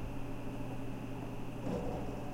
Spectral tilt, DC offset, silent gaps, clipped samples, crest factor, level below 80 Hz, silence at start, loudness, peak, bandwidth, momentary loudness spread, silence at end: -7.5 dB/octave; under 0.1%; none; under 0.1%; 14 dB; -48 dBFS; 0 s; -42 LUFS; -24 dBFS; 16.5 kHz; 5 LU; 0 s